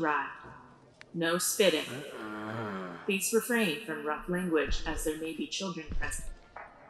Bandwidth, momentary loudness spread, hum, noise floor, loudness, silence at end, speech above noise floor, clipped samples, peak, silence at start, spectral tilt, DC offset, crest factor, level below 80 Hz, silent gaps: 15.5 kHz; 14 LU; none; -56 dBFS; -32 LUFS; 0 s; 25 dB; under 0.1%; -12 dBFS; 0 s; -3.5 dB/octave; under 0.1%; 20 dB; -44 dBFS; none